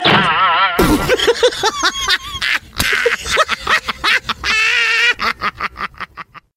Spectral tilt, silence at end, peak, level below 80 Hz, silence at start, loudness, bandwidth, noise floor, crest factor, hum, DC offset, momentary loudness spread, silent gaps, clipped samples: -2.5 dB/octave; 0.15 s; 0 dBFS; -34 dBFS; 0 s; -14 LUFS; 16 kHz; -36 dBFS; 16 dB; none; under 0.1%; 11 LU; none; under 0.1%